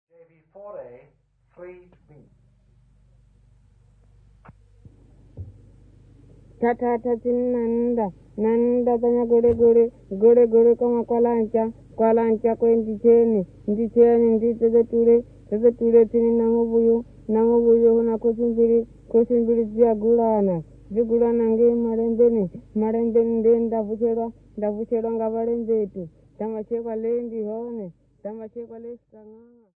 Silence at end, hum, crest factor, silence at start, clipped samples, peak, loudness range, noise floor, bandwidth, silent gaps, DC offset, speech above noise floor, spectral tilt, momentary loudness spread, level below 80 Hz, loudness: 0.45 s; none; 16 dB; 0.55 s; under 0.1%; -4 dBFS; 9 LU; -57 dBFS; 2.7 kHz; none; under 0.1%; 37 dB; -11.5 dB/octave; 14 LU; -52 dBFS; -20 LUFS